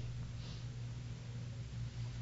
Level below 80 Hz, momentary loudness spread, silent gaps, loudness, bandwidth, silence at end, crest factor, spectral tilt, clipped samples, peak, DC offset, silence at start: -54 dBFS; 2 LU; none; -46 LUFS; 7.6 kHz; 0 s; 10 dB; -6.5 dB/octave; under 0.1%; -34 dBFS; under 0.1%; 0 s